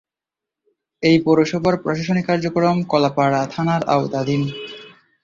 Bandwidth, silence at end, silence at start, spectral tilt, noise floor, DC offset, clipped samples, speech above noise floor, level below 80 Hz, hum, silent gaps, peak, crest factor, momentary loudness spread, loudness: 7.6 kHz; 0.35 s; 1 s; -6.5 dB/octave; -87 dBFS; under 0.1%; under 0.1%; 69 dB; -56 dBFS; none; none; -2 dBFS; 16 dB; 6 LU; -19 LUFS